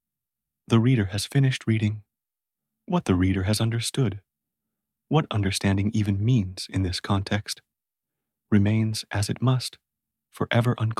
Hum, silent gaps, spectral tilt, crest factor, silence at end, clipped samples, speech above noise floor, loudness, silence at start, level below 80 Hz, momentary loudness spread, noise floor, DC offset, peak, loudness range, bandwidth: none; none; -6 dB/octave; 18 dB; 0.05 s; under 0.1%; 66 dB; -25 LUFS; 0.7 s; -54 dBFS; 7 LU; -89 dBFS; under 0.1%; -6 dBFS; 2 LU; 13.5 kHz